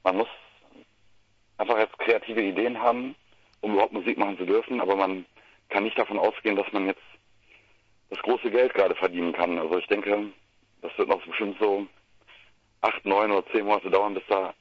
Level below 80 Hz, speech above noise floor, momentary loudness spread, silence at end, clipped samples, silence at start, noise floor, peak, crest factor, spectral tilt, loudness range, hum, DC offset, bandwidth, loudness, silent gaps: -70 dBFS; 37 dB; 9 LU; 0.1 s; under 0.1%; 0.05 s; -63 dBFS; -4 dBFS; 22 dB; -6.5 dB/octave; 3 LU; none; under 0.1%; 6.4 kHz; -26 LUFS; none